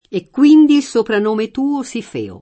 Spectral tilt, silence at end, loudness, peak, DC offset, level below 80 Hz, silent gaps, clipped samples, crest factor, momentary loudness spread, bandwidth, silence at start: -5.5 dB/octave; 0.05 s; -14 LUFS; -2 dBFS; under 0.1%; -58 dBFS; none; under 0.1%; 12 dB; 15 LU; 8.8 kHz; 0.1 s